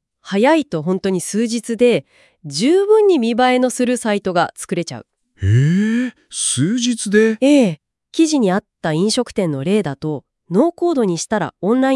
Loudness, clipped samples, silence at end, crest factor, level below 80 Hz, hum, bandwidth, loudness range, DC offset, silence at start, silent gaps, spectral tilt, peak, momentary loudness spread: -17 LUFS; under 0.1%; 0 s; 16 dB; -56 dBFS; none; 12 kHz; 2 LU; under 0.1%; 0.25 s; none; -5 dB/octave; -2 dBFS; 10 LU